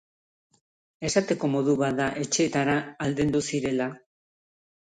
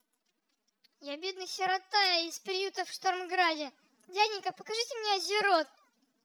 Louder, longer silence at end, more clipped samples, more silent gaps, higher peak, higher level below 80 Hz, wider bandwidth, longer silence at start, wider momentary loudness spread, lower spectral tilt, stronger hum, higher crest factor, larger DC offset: first, -26 LUFS vs -31 LUFS; first, 0.9 s vs 0.6 s; neither; neither; first, -8 dBFS vs -14 dBFS; first, -58 dBFS vs under -90 dBFS; second, 9.8 kHz vs over 20 kHz; about the same, 1 s vs 1 s; second, 6 LU vs 12 LU; first, -4.5 dB/octave vs -0.5 dB/octave; neither; about the same, 18 dB vs 20 dB; neither